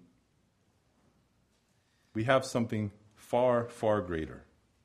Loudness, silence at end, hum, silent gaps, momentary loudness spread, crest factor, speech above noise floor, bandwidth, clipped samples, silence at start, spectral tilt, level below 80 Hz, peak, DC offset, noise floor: -31 LUFS; 0.45 s; none; none; 12 LU; 24 dB; 42 dB; 15 kHz; under 0.1%; 2.15 s; -6 dB/octave; -60 dBFS; -10 dBFS; under 0.1%; -72 dBFS